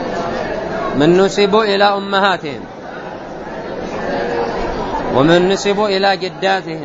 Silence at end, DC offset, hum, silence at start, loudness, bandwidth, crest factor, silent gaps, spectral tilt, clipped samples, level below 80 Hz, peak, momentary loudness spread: 0 s; under 0.1%; none; 0 s; -15 LUFS; 8 kHz; 16 dB; none; -5 dB/octave; under 0.1%; -38 dBFS; 0 dBFS; 16 LU